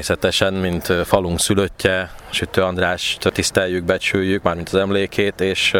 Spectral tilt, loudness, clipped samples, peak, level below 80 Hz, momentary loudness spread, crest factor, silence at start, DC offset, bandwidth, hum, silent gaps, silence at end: -4 dB/octave; -19 LUFS; under 0.1%; 0 dBFS; -42 dBFS; 3 LU; 18 dB; 0 s; under 0.1%; 19.5 kHz; none; none; 0 s